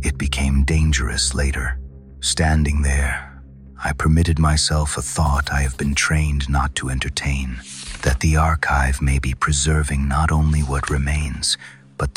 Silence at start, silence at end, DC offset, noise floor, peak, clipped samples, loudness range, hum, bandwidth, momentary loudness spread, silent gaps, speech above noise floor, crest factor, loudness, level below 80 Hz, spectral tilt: 0 s; 0.05 s; 0.1%; -40 dBFS; -6 dBFS; under 0.1%; 2 LU; none; 13.5 kHz; 9 LU; none; 21 dB; 14 dB; -20 LUFS; -24 dBFS; -4 dB/octave